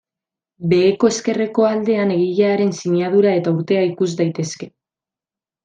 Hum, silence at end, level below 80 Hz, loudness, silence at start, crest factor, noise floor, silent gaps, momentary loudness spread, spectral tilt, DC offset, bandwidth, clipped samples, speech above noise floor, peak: none; 0.95 s; -62 dBFS; -17 LUFS; 0.6 s; 16 dB; -90 dBFS; none; 9 LU; -6 dB/octave; under 0.1%; 9.4 kHz; under 0.1%; 73 dB; -2 dBFS